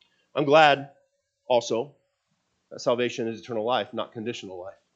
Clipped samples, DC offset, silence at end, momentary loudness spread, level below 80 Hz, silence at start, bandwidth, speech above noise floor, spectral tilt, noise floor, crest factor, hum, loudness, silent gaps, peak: under 0.1%; under 0.1%; 0.25 s; 20 LU; -80 dBFS; 0.35 s; 8 kHz; 50 dB; -4.5 dB/octave; -75 dBFS; 24 dB; none; -25 LUFS; none; -2 dBFS